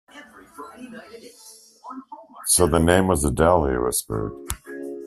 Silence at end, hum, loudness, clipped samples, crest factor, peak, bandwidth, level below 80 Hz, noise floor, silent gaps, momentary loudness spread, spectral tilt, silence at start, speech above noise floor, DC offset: 0 s; none; -20 LUFS; under 0.1%; 20 dB; -2 dBFS; 15 kHz; -38 dBFS; -46 dBFS; none; 24 LU; -4.5 dB/octave; 0.15 s; 25 dB; under 0.1%